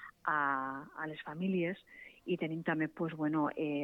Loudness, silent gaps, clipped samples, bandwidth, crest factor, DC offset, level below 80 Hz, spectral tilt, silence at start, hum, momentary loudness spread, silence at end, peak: -36 LUFS; none; under 0.1%; 4.4 kHz; 18 dB; under 0.1%; -76 dBFS; -8.5 dB/octave; 0 s; none; 10 LU; 0 s; -18 dBFS